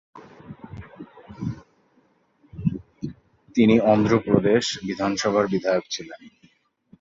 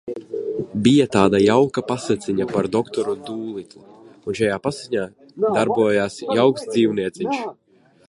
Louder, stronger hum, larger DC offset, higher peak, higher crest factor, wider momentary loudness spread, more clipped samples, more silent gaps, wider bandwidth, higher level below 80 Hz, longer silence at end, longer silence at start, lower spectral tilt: about the same, -22 LUFS vs -20 LUFS; neither; neither; about the same, -2 dBFS vs 0 dBFS; about the same, 22 dB vs 20 dB; first, 25 LU vs 14 LU; neither; neither; second, 7.8 kHz vs 11.5 kHz; about the same, -52 dBFS vs -54 dBFS; first, 0.7 s vs 0.55 s; about the same, 0.15 s vs 0.05 s; about the same, -5.5 dB/octave vs -6 dB/octave